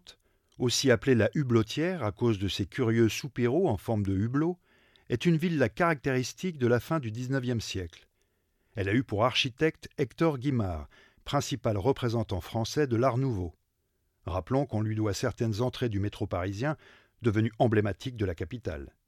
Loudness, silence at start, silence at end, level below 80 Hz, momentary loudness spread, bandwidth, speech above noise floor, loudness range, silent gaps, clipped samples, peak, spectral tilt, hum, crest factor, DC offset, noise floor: -29 LUFS; 0.1 s; 0.2 s; -54 dBFS; 10 LU; 15 kHz; 47 dB; 4 LU; none; under 0.1%; -10 dBFS; -6 dB/octave; none; 20 dB; under 0.1%; -76 dBFS